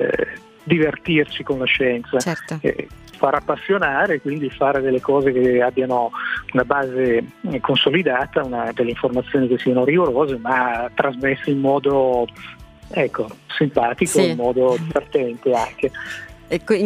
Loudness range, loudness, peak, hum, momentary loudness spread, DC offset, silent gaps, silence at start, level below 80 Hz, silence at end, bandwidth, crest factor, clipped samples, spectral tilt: 2 LU; -19 LUFS; 0 dBFS; none; 8 LU; under 0.1%; none; 0 s; -48 dBFS; 0 s; 15 kHz; 20 dB; under 0.1%; -5 dB/octave